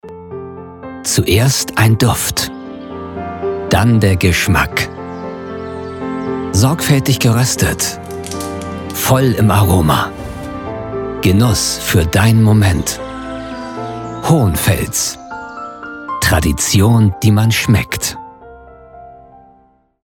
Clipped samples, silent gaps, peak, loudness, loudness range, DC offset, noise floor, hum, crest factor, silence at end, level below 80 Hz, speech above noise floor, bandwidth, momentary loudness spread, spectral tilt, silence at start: under 0.1%; none; -2 dBFS; -14 LUFS; 2 LU; under 0.1%; -51 dBFS; none; 14 dB; 0.7 s; -32 dBFS; 39 dB; 18.5 kHz; 15 LU; -5 dB/octave; 0.05 s